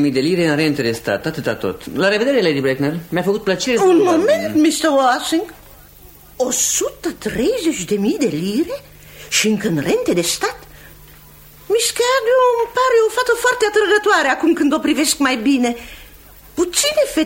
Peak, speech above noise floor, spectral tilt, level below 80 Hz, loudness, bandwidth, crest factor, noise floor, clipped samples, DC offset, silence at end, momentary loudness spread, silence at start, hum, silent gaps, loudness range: -2 dBFS; 26 dB; -3.5 dB/octave; -48 dBFS; -16 LUFS; 16.5 kHz; 16 dB; -43 dBFS; under 0.1%; under 0.1%; 0 s; 8 LU; 0 s; none; none; 4 LU